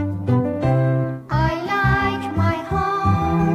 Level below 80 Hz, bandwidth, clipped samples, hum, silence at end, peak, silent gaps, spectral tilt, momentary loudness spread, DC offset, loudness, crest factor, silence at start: -36 dBFS; 8.4 kHz; under 0.1%; none; 0 s; -6 dBFS; none; -8 dB/octave; 4 LU; under 0.1%; -20 LUFS; 14 dB; 0 s